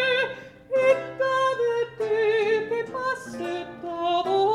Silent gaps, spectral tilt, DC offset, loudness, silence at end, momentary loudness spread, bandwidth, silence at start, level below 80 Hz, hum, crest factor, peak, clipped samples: none; -4 dB/octave; under 0.1%; -25 LUFS; 0 s; 10 LU; 11.5 kHz; 0 s; -64 dBFS; none; 16 dB; -8 dBFS; under 0.1%